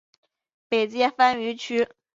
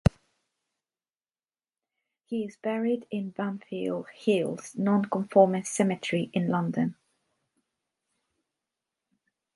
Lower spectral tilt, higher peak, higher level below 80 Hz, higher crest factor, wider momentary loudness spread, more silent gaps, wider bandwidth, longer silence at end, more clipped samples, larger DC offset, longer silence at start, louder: second, -3.5 dB/octave vs -6.5 dB/octave; about the same, -6 dBFS vs -6 dBFS; second, -70 dBFS vs -50 dBFS; about the same, 20 dB vs 24 dB; second, 7 LU vs 11 LU; neither; second, 7.8 kHz vs 11.5 kHz; second, 0.3 s vs 2.65 s; neither; neither; first, 0.7 s vs 0.05 s; first, -23 LUFS vs -28 LUFS